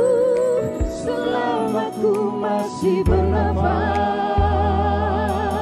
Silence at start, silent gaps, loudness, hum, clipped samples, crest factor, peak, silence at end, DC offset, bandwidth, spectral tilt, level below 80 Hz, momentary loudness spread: 0 s; none; -20 LUFS; none; under 0.1%; 14 dB; -6 dBFS; 0 s; under 0.1%; 13 kHz; -7 dB/octave; -30 dBFS; 4 LU